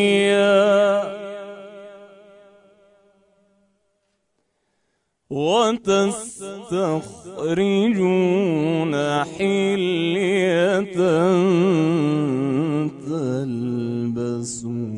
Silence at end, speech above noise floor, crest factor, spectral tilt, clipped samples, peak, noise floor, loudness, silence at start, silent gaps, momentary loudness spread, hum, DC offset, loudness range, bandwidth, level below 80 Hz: 0 s; 52 dB; 16 dB; -6 dB/octave; under 0.1%; -4 dBFS; -72 dBFS; -20 LUFS; 0 s; none; 13 LU; none; under 0.1%; 7 LU; 11 kHz; -62 dBFS